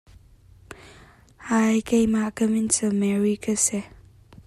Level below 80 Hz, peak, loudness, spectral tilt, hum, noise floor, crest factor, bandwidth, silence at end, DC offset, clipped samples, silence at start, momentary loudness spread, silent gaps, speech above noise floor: -52 dBFS; -6 dBFS; -22 LUFS; -4.5 dB/octave; none; -52 dBFS; 18 dB; 13.5 kHz; 0.6 s; under 0.1%; under 0.1%; 0.7 s; 7 LU; none; 30 dB